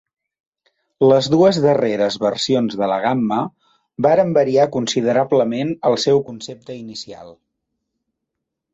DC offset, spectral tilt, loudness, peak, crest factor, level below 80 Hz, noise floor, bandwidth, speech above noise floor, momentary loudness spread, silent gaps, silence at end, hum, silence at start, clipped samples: under 0.1%; -5.5 dB/octave; -17 LUFS; -2 dBFS; 16 dB; -60 dBFS; -80 dBFS; 8 kHz; 63 dB; 17 LU; none; 1.4 s; none; 1 s; under 0.1%